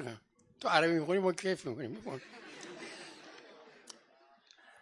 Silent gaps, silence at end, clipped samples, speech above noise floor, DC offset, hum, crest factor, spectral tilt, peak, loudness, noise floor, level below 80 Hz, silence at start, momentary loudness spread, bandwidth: none; 0.9 s; under 0.1%; 32 dB; under 0.1%; none; 26 dB; -4.5 dB/octave; -12 dBFS; -34 LUFS; -65 dBFS; -80 dBFS; 0 s; 25 LU; 11.5 kHz